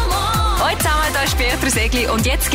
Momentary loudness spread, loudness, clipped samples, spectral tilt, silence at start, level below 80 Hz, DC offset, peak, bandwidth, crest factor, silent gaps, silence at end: 1 LU; -17 LUFS; under 0.1%; -3.5 dB/octave; 0 s; -22 dBFS; under 0.1%; -8 dBFS; 16 kHz; 10 dB; none; 0 s